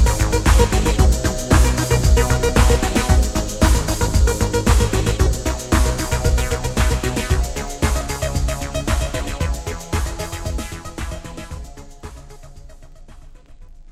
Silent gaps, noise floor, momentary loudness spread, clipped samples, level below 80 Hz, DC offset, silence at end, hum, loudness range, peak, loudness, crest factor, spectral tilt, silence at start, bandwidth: none; -40 dBFS; 14 LU; under 0.1%; -20 dBFS; under 0.1%; 0.1 s; none; 13 LU; 0 dBFS; -19 LUFS; 18 dB; -5 dB/octave; 0 s; 15.5 kHz